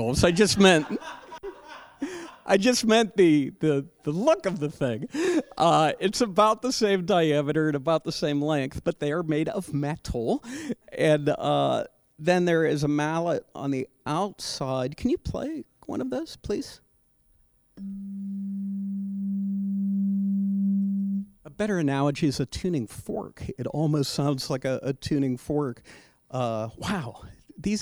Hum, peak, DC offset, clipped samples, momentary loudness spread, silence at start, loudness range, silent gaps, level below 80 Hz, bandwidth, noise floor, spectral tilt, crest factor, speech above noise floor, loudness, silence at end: none; -6 dBFS; under 0.1%; under 0.1%; 14 LU; 0 s; 8 LU; none; -50 dBFS; over 20 kHz; -64 dBFS; -5.5 dB/octave; 20 dB; 39 dB; -26 LUFS; 0 s